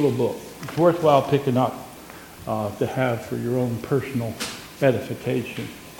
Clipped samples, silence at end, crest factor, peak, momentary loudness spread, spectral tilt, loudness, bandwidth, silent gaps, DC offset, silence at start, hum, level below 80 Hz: under 0.1%; 0 s; 20 dB; -4 dBFS; 15 LU; -6.5 dB/octave; -23 LUFS; 17.5 kHz; none; under 0.1%; 0 s; none; -56 dBFS